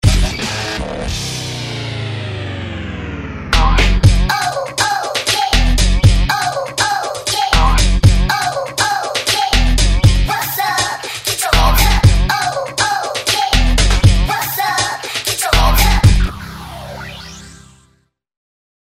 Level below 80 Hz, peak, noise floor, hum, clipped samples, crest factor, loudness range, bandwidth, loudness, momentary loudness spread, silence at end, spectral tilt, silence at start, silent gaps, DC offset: -18 dBFS; 0 dBFS; -59 dBFS; none; under 0.1%; 14 dB; 4 LU; 16.5 kHz; -15 LUFS; 12 LU; 1.45 s; -3.5 dB/octave; 0.05 s; none; under 0.1%